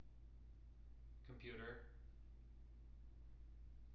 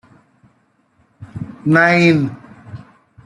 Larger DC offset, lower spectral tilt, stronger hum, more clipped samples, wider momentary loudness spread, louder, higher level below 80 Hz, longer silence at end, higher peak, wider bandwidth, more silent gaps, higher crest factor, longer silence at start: neither; second, -5 dB/octave vs -7 dB/octave; neither; neither; second, 11 LU vs 26 LU; second, -61 LUFS vs -14 LUFS; about the same, -60 dBFS vs -56 dBFS; second, 0 s vs 0.5 s; second, -40 dBFS vs 0 dBFS; second, 5.6 kHz vs 11 kHz; neither; about the same, 18 dB vs 18 dB; second, 0 s vs 1.2 s